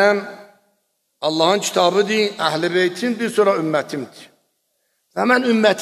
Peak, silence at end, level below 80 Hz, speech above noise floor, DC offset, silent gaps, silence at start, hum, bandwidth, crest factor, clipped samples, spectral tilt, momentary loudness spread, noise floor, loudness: 0 dBFS; 0 s; -72 dBFS; 51 dB; under 0.1%; none; 0 s; none; 14 kHz; 18 dB; under 0.1%; -4 dB/octave; 12 LU; -69 dBFS; -18 LUFS